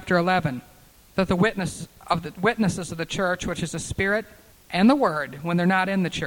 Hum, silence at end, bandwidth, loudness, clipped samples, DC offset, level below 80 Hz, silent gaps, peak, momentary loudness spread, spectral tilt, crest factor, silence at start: none; 0 s; 18 kHz; -24 LUFS; under 0.1%; under 0.1%; -48 dBFS; none; -6 dBFS; 10 LU; -5.5 dB/octave; 18 dB; 0 s